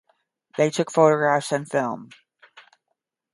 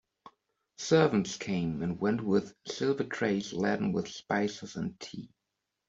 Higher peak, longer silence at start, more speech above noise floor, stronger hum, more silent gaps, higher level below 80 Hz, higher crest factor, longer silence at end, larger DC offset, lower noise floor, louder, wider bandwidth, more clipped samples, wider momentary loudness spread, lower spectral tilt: first, -2 dBFS vs -10 dBFS; second, 0.55 s vs 0.8 s; about the same, 57 dB vs 55 dB; neither; neither; second, -74 dBFS vs -66 dBFS; about the same, 22 dB vs 20 dB; first, 1.3 s vs 0.65 s; neither; second, -78 dBFS vs -85 dBFS; first, -21 LUFS vs -31 LUFS; first, 11.5 kHz vs 8 kHz; neither; about the same, 14 LU vs 13 LU; about the same, -5 dB/octave vs -5.5 dB/octave